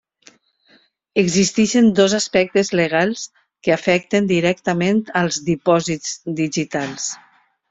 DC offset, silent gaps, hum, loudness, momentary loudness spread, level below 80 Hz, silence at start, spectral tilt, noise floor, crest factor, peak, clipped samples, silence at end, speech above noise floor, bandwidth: under 0.1%; none; none; -18 LUFS; 10 LU; -56 dBFS; 1.15 s; -4.5 dB/octave; -56 dBFS; 16 dB; -2 dBFS; under 0.1%; 0.55 s; 39 dB; 8.2 kHz